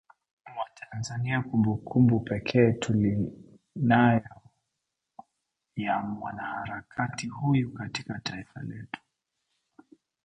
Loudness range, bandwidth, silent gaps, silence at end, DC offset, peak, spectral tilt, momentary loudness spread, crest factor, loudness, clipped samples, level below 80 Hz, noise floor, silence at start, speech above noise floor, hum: 8 LU; 9.4 kHz; none; 1.3 s; under 0.1%; -8 dBFS; -7 dB/octave; 17 LU; 22 dB; -28 LUFS; under 0.1%; -58 dBFS; -84 dBFS; 0.45 s; 57 dB; none